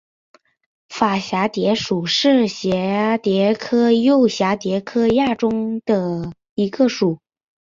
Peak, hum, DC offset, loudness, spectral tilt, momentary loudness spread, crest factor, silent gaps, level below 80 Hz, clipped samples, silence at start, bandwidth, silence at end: -2 dBFS; none; under 0.1%; -18 LUFS; -5.5 dB/octave; 8 LU; 16 dB; 6.49-6.56 s; -54 dBFS; under 0.1%; 0.9 s; 7.6 kHz; 0.6 s